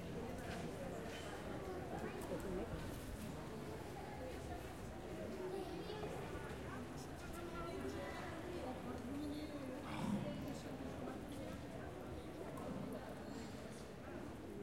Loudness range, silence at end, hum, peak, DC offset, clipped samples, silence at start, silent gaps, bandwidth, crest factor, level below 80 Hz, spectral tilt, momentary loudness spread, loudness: 3 LU; 0 s; none; -30 dBFS; under 0.1%; under 0.1%; 0 s; none; 16.5 kHz; 16 dB; -60 dBFS; -6 dB/octave; 5 LU; -48 LUFS